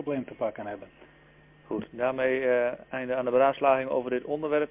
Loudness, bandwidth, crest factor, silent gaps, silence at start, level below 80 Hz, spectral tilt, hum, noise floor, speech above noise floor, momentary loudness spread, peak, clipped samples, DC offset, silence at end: -28 LUFS; 3.8 kHz; 18 dB; none; 0 s; -64 dBFS; -9.5 dB/octave; none; -56 dBFS; 29 dB; 13 LU; -10 dBFS; under 0.1%; under 0.1%; 0.05 s